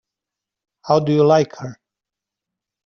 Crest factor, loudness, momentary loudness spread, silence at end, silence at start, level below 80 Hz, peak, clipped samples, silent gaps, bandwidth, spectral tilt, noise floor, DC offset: 18 dB; -17 LUFS; 20 LU; 1.1 s; 0.85 s; -62 dBFS; -2 dBFS; under 0.1%; none; 6.8 kHz; -6.5 dB/octave; -86 dBFS; under 0.1%